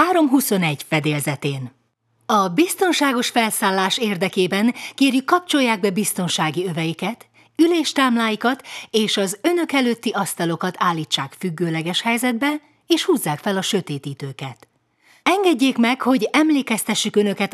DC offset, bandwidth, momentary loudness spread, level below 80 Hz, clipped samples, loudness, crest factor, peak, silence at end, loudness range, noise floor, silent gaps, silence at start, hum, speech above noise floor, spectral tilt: under 0.1%; 14.5 kHz; 10 LU; -74 dBFS; under 0.1%; -19 LUFS; 18 dB; -2 dBFS; 0.05 s; 3 LU; -65 dBFS; none; 0 s; none; 45 dB; -4 dB/octave